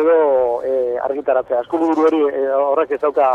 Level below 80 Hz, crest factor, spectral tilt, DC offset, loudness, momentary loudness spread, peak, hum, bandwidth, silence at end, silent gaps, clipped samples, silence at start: -58 dBFS; 12 dB; -6.5 dB/octave; under 0.1%; -17 LUFS; 5 LU; -4 dBFS; none; 6.8 kHz; 0 s; none; under 0.1%; 0 s